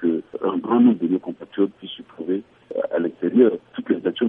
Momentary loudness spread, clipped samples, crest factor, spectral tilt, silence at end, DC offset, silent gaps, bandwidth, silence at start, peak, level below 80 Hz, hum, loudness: 15 LU; under 0.1%; 18 dB; -9.5 dB/octave; 0 s; under 0.1%; none; 3.7 kHz; 0 s; -4 dBFS; -70 dBFS; none; -22 LUFS